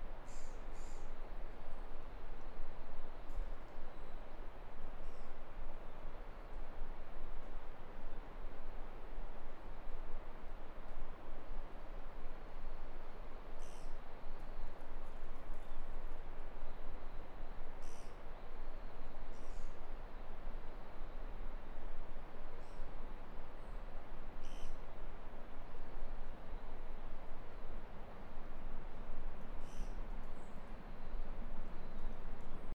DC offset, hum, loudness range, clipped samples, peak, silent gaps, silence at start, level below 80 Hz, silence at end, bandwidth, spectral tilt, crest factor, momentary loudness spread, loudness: under 0.1%; none; 1 LU; under 0.1%; -26 dBFS; none; 0 s; -44 dBFS; 0 s; 3.7 kHz; -6 dB/octave; 10 dB; 3 LU; -53 LUFS